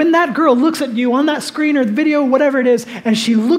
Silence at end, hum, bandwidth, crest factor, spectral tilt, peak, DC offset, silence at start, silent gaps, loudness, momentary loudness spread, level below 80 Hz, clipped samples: 0 s; none; 15.5 kHz; 14 dB; -5 dB/octave; 0 dBFS; under 0.1%; 0 s; none; -14 LUFS; 5 LU; -70 dBFS; under 0.1%